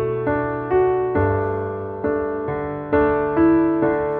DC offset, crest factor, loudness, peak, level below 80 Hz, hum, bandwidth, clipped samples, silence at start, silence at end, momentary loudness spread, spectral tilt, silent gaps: under 0.1%; 14 dB; -20 LUFS; -6 dBFS; -42 dBFS; none; 4.2 kHz; under 0.1%; 0 s; 0 s; 9 LU; -11.5 dB/octave; none